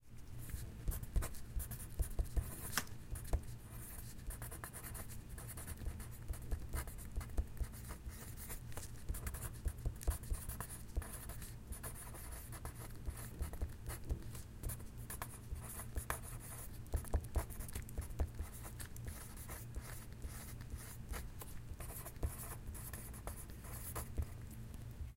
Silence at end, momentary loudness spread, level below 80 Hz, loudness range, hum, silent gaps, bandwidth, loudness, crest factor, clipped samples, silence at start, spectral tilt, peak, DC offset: 0 s; 7 LU; -46 dBFS; 4 LU; none; none; 16.5 kHz; -47 LUFS; 26 dB; under 0.1%; 0 s; -4.5 dB/octave; -18 dBFS; under 0.1%